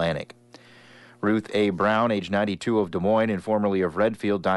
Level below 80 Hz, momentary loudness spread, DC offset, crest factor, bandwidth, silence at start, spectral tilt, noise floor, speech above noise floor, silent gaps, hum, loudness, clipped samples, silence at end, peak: -58 dBFS; 5 LU; under 0.1%; 14 dB; 11.5 kHz; 0 s; -6.5 dB/octave; -50 dBFS; 27 dB; none; none; -24 LUFS; under 0.1%; 0 s; -10 dBFS